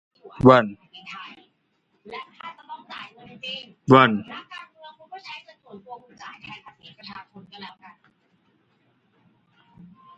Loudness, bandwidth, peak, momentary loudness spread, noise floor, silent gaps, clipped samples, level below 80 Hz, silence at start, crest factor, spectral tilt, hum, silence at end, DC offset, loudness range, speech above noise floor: -18 LUFS; 7.8 kHz; 0 dBFS; 27 LU; -69 dBFS; none; under 0.1%; -58 dBFS; 0.45 s; 26 dB; -7.5 dB/octave; none; 2.5 s; under 0.1%; 20 LU; 50 dB